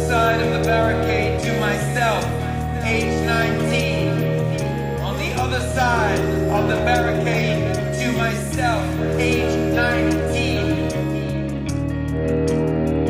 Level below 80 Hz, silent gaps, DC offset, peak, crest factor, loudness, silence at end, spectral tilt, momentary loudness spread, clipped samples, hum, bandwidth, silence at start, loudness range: -32 dBFS; none; under 0.1%; -6 dBFS; 14 dB; -20 LUFS; 0 s; -6 dB/octave; 6 LU; under 0.1%; none; 16 kHz; 0 s; 1 LU